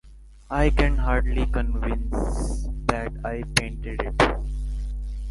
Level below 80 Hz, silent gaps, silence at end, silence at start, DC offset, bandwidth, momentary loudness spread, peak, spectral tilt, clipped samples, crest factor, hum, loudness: -26 dBFS; none; 0 s; 0.05 s; under 0.1%; 11.5 kHz; 10 LU; -2 dBFS; -5 dB/octave; under 0.1%; 22 dB; none; -26 LUFS